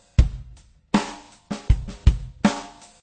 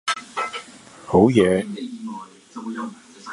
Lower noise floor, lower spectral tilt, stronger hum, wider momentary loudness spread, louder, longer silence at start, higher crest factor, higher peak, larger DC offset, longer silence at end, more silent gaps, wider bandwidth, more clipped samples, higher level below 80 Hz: first, -48 dBFS vs -43 dBFS; about the same, -6.5 dB/octave vs -6 dB/octave; neither; second, 16 LU vs 24 LU; second, -25 LUFS vs -21 LUFS; first, 0.2 s vs 0.05 s; about the same, 22 dB vs 20 dB; about the same, -2 dBFS vs -2 dBFS; neither; first, 0.35 s vs 0 s; neither; second, 9.2 kHz vs 11.5 kHz; neither; first, -26 dBFS vs -50 dBFS